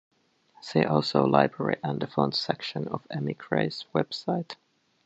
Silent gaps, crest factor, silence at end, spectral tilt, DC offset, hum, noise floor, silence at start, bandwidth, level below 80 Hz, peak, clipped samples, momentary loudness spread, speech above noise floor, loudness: none; 24 dB; 0.5 s; -6.5 dB/octave; under 0.1%; none; -61 dBFS; 0.65 s; 8 kHz; -66 dBFS; -4 dBFS; under 0.1%; 11 LU; 34 dB; -27 LUFS